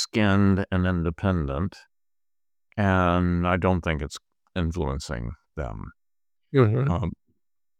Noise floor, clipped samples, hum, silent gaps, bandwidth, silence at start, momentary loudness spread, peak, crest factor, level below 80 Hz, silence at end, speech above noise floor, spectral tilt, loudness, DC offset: under -90 dBFS; under 0.1%; none; none; 10 kHz; 0 s; 14 LU; -6 dBFS; 20 dB; -42 dBFS; 0.65 s; over 66 dB; -7 dB/octave; -25 LUFS; under 0.1%